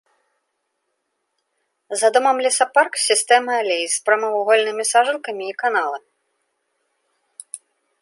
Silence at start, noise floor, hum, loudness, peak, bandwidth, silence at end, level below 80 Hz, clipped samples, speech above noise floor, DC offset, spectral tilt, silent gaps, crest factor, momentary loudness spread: 1.9 s; -74 dBFS; none; -18 LUFS; -2 dBFS; 12 kHz; 0.45 s; -82 dBFS; under 0.1%; 56 dB; under 0.1%; 0.5 dB/octave; none; 20 dB; 14 LU